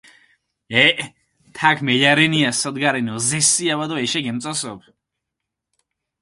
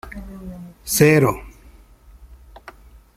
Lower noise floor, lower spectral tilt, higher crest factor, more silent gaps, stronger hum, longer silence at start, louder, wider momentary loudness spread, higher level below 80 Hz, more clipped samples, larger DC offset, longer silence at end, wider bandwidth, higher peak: first, -82 dBFS vs -47 dBFS; second, -2.5 dB/octave vs -5 dB/octave; about the same, 20 dB vs 22 dB; neither; neither; first, 0.7 s vs 0.05 s; about the same, -17 LUFS vs -16 LUFS; second, 11 LU vs 22 LU; second, -62 dBFS vs -44 dBFS; neither; neither; second, 1.45 s vs 1.65 s; second, 11.5 kHz vs 16 kHz; about the same, 0 dBFS vs 0 dBFS